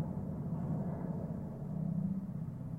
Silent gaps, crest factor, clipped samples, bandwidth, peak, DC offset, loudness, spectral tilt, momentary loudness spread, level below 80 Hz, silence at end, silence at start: none; 12 dB; under 0.1%; 2.5 kHz; -26 dBFS; under 0.1%; -39 LUFS; -11.5 dB/octave; 5 LU; -58 dBFS; 0 s; 0 s